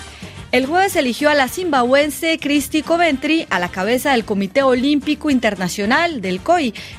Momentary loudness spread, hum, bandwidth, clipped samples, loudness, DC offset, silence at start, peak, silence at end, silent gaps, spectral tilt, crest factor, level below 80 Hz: 4 LU; none; 16 kHz; under 0.1%; -17 LUFS; under 0.1%; 0 s; -2 dBFS; 0 s; none; -4 dB/octave; 14 dB; -46 dBFS